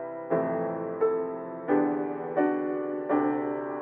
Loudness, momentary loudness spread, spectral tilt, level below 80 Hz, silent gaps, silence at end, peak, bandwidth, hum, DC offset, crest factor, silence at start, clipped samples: -29 LUFS; 6 LU; -8 dB/octave; -74 dBFS; none; 0 s; -12 dBFS; 3.4 kHz; none; under 0.1%; 16 dB; 0 s; under 0.1%